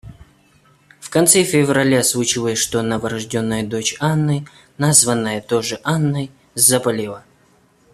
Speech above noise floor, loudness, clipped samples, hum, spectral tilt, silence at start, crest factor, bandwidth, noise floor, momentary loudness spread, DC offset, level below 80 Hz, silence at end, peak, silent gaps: 38 dB; -17 LUFS; under 0.1%; none; -3.5 dB/octave; 0.05 s; 18 dB; 14.5 kHz; -55 dBFS; 12 LU; under 0.1%; -52 dBFS; 0.75 s; 0 dBFS; none